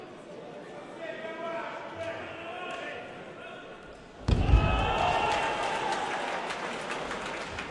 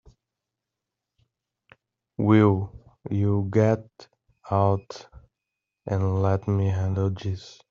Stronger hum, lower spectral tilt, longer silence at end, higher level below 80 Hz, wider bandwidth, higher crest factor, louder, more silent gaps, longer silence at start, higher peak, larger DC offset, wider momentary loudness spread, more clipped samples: neither; second, -5 dB/octave vs -8.5 dB/octave; second, 0 s vs 0.2 s; first, -38 dBFS vs -58 dBFS; first, 11.5 kHz vs 7 kHz; about the same, 22 dB vs 20 dB; second, -31 LUFS vs -24 LUFS; neither; second, 0 s vs 2.2 s; second, -10 dBFS vs -6 dBFS; neither; about the same, 18 LU vs 20 LU; neither